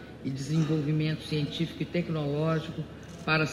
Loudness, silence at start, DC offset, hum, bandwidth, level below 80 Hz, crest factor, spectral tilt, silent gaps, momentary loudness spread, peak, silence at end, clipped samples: -30 LUFS; 0 s; under 0.1%; none; 12 kHz; -56 dBFS; 16 dB; -6.5 dB/octave; none; 10 LU; -12 dBFS; 0 s; under 0.1%